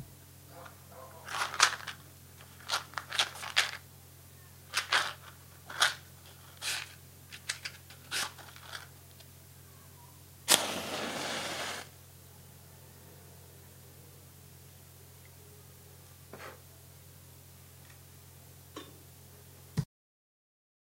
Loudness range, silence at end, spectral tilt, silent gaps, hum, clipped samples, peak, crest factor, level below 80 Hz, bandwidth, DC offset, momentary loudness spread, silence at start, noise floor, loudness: 20 LU; 0.95 s; -1 dB/octave; none; none; under 0.1%; 0 dBFS; 38 dB; -70 dBFS; 16 kHz; under 0.1%; 24 LU; 0 s; -54 dBFS; -33 LUFS